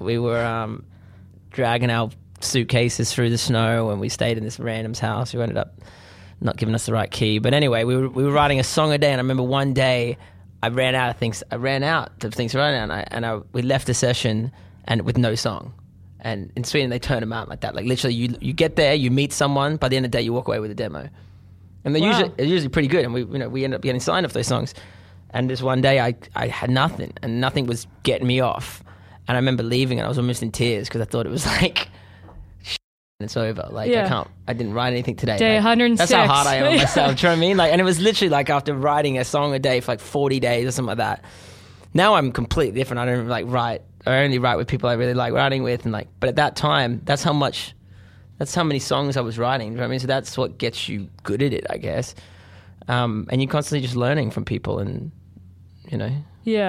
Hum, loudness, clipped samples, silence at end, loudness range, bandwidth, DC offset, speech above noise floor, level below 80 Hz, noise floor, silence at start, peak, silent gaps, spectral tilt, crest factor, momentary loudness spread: none; -21 LUFS; under 0.1%; 0 s; 7 LU; 15 kHz; under 0.1%; 25 dB; -46 dBFS; -46 dBFS; 0 s; -2 dBFS; 32.84-33.19 s; -5 dB/octave; 20 dB; 11 LU